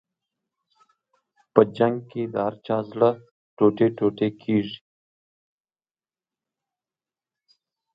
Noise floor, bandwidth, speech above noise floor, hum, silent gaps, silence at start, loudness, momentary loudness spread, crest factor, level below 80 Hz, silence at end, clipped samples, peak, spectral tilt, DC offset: under -90 dBFS; 5.2 kHz; over 68 dB; none; 3.31-3.57 s; 1.55 s; -23 LUFS; 10 LU; 26 dB; -68 dBFS; 3.2 s; under 0.1%; 0 dBFS; -9.5 dB/octave; under 0.1%